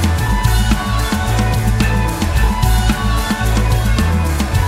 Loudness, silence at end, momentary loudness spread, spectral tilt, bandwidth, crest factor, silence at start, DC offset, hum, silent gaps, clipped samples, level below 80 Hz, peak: -16 LUFS; 0 s; 2 LU; -5 dB/octave; 16 kHz; 14 dB; 0 s; under 0.1%; none; none; under 0.1%; -18 dBFS; 0 dBFS